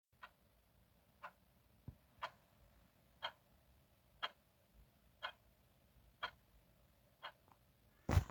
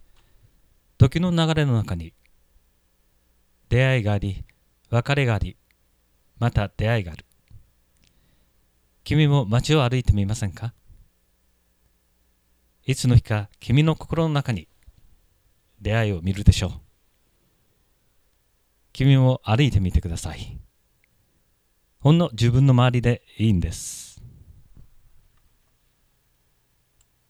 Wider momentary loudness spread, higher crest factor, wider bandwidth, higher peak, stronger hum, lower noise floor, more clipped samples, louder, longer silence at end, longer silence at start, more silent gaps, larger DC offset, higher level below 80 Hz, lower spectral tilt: about the same, 14 LU vs 16 LU; first, 30 dB vs 24 dB; first, 19.5 kHz vs 13 kHz; second, -20 dBFS vs 0 dBFS; neither; first, -73 dBFS vs -66 dBFS; neither; second, -49 LUFS vs -22 LUFS; second, 0 s vs 3.05 s; second, 0.25 s vs 1 s; neither; neither; second, -60 dBFS vs -36 dBFS; about the same, -5.5 dB/octave vs -6.5 dB/octave